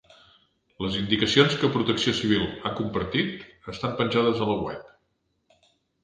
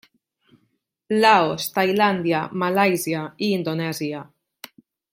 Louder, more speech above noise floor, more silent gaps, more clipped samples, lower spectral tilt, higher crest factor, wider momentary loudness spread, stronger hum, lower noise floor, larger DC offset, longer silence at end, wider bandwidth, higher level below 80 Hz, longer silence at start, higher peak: second, -25 LUFS vs -21 LUFS; about the same, 48 dB vs 50 dB; neither; neither; about the same, -5 dB/octave vs -5 dB/octave; about the same, 24 dB vs 20 dB; about the same, 13 LU vs 11 LU; neither; about the same, -73 dBFS vs -70 dBFS; neither; first, 1.15 s vs 0.9 s; second, 9.8 kHz vs 16.5 kHz; first, -52 dBFS vs -68 dBFS; second, 0.8 s vs 1.1 s; about the same, -4 dBFS vs -4 dBFS